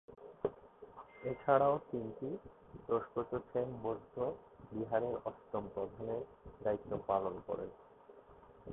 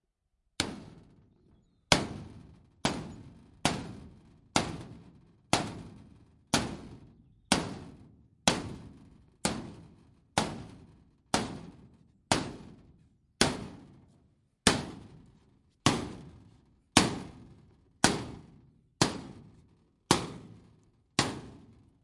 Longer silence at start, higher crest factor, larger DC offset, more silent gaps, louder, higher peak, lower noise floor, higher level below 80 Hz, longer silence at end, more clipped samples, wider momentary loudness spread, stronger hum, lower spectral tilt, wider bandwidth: second, 0.1 s vs 0.6 s; second, 22 dB vs 32 dB; neither; neither; second, -39 LUFS vs -31 LUFS; second, -16 dBFS vs -2 dBFS; second, -60 dBFS vs -78 dBFS; second, -66 dBFS vs -56 dBFS; second, 0 s vs 0.45 s; neither; about the same, 21 LU vs 23 LU; neither; about the same, -4 dB/octave vs -3 dB/octave; second, 3.9 kHz vs 11.5 kHz